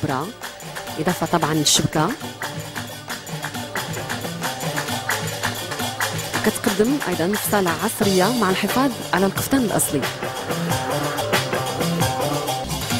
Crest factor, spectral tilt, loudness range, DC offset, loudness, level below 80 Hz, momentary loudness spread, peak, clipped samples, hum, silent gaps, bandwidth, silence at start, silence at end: 20 dB; -3.5 dB/octave; 6 LU; under 0.1%; -22 LUFS; -48 dBFS; 11 LU; -2 dBFS; under 0.1%; none; none; over 20 kHz; 0 s; 0 s